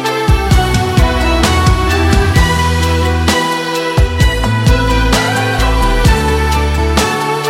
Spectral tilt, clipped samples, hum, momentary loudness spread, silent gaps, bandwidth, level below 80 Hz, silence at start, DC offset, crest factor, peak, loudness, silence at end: -5 dB/octave; under 0.1%; none; 3 LU; none; 16.5 kHz; -16 dBFS; 0 s; under 0.1%; 10 dB; 0 dBFS; -12 LUFS; 0 s